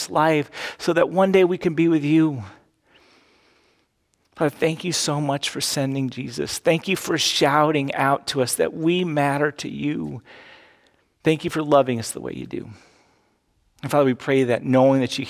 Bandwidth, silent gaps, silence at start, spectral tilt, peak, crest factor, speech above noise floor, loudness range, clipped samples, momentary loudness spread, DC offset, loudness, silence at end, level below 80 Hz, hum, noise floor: 16 kHz; none; 0 s; -4.5 dB/octave; -4 dBFS; 18 dB; 47 dB; 5 LU; under 0.1%; 12 LU; under 0.1%; -21 LUFS; 0 s; -60 dBFS; none; -68 dBFS